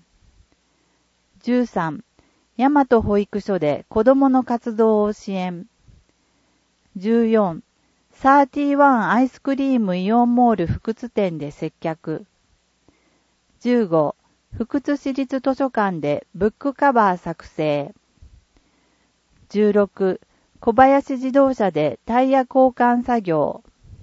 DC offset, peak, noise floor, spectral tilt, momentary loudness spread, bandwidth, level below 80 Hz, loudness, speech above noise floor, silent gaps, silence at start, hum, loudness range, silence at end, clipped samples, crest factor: under 0.1%; 0 dBFS; -64 dBFS; -7.5 dB/octave; 13 LU; 7.8 kHz; -50 dBFS; -19 LUFS; 46 dB; none; 1.45 s; none; 7 LU; 0.45 s; under 0.1%; 20 dB